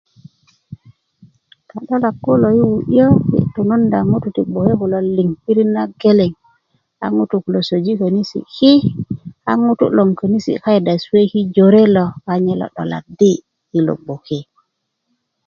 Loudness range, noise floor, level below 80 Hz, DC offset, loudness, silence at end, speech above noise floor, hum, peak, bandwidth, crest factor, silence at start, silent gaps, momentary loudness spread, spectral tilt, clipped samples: 3 LU; -71 dBFS; -48 dBFS; under 0.1%; -15 LUFS; 1.05 s; 57 dB; none; 0 dBFS; 7.2 kHz; 14 dB; 0.7 s; none; 13 LU; -8 dB/octave; under 0.1%